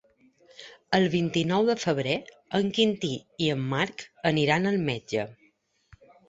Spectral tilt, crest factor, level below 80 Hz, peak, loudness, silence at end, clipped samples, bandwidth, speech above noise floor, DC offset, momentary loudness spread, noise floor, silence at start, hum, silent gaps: -5.5 dB/octave; 22 dB; -62 dBFS; -6 dBFS; -26 LUFS; 0.95 s; under 0.1%; 8 kHz; 40 dB; under 0.1%; 8 LU; -66 dBFS; 0.6 s; none; none